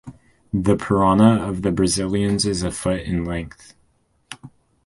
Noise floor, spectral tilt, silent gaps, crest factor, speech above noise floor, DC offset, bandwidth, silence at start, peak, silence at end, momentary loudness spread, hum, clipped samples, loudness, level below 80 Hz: -63 dBFS; -5.5 dB/octave; none; 18 dB; 44 dB; under 0.1%; 11.5 kHz; 0.05 s; -2 dBFS; 0.4 s; 23 LU; none; under 0.1%; -20 LUFS; -40 dBFS